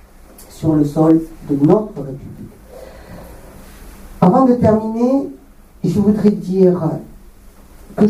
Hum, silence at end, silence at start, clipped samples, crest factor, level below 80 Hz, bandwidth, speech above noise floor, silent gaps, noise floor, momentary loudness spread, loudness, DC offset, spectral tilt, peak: none; 0 s; 0.4 s; under 0.1%; 16 dB; -42 dBFS; 15 kHz; 27 dB; none; -41 dBFS; 24 LU; -15 LUFS; under 0.1%; -9 dB/octave; 0 dBFS